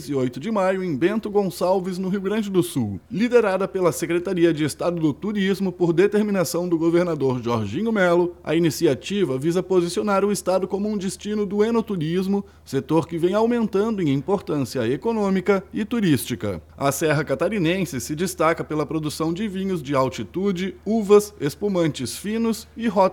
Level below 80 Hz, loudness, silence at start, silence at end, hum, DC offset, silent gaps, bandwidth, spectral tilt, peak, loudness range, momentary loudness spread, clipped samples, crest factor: -52 dBFS; -22 LUFS; 0 s; 0 s; none; under 0.1%; none; 18 kHz; -6 dB/octave; -4 dBFS; 2 LU; 7 LU; under 0.1%; 16 dB